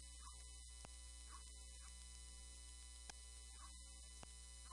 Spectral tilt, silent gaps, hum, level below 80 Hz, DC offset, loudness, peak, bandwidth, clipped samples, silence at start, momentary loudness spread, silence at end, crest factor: -1.5 dB/octave; none; 60 Hz at -60 dBFS; -60 dBFS; under 0.1%; -57 LUFS; -36 dBFS; 11.5 kHz; under 0.1%; 0 s; 1 LU; 0 s; 22 dB